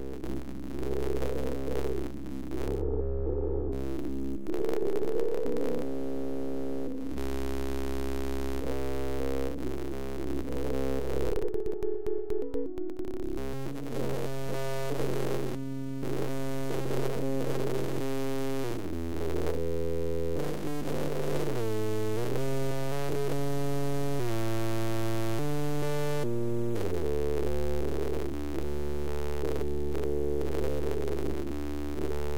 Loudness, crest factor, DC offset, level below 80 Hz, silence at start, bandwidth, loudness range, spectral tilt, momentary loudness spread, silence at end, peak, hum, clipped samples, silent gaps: -33 LUFS; 14 dB; 3%; -42 dBFS; 0 s; 17 kHz; 3 LU; -6.5 dB/octave; 4 LU; 0 s; -16 dBFS; none; under 0.1%; none